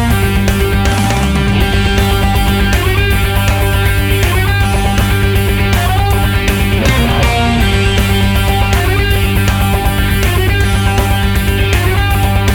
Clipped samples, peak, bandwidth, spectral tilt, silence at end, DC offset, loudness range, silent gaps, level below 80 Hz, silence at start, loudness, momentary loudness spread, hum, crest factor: under 0.1%; 0 dBFS; over 20 kHz; -5 dB/octave; 0 s; under 0.1%; 1 LU; none; -16 dBFS; 0 s; -12 LUFS; 1 LU; none; 10 dB